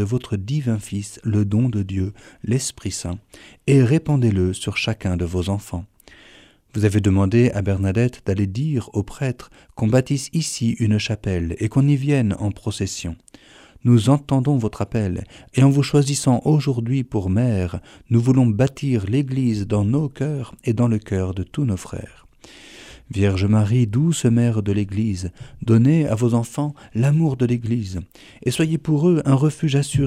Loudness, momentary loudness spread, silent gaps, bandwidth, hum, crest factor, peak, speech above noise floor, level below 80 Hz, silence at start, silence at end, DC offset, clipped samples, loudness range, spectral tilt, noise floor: -20 LUFS; 11 LU; none; 13.5 kHz; none; 16 dB; -4 dBFS; 30 dB; -46 dBFS; 0 s; 0 s; under 0.1%; under 0.1%; 3 LU; -6.5 dB/octave; -50 dBFS